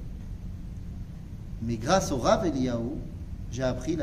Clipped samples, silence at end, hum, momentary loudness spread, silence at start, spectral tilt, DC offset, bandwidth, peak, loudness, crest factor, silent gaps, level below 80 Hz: under 0.1%; 0 s; none; 16 LU; 0 s; -5.5 dB/octave; under 0.1%; 15 kHz; -8 dBFS; -28 LUFS; 20 dB; none; -40 dBFS